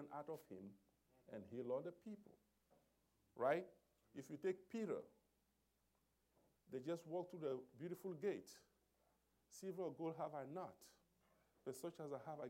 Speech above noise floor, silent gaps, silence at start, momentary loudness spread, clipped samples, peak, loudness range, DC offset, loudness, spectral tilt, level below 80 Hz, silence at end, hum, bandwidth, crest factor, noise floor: 35 dB; none; 0 s; 15 LU; under 0.1%; -28 dBFS; 4 LU; under 0.1%; -50 LUFS; -6 dB/octave; -90 dBFS; 0 s; none; 16 kHz; 24 dB; -85 dBFS